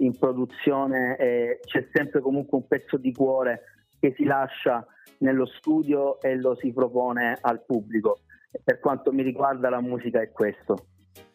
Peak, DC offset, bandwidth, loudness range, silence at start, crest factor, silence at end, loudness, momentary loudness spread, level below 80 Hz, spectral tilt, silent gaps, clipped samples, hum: -6 dBFS; under 0.1%; 15.5 kHz; 1 LU; 0 s; 18 dB; 0.15 s; -25 LUFS; 4 LU; -70 dBFS; -8 dB/octave; none; under 0.1%; none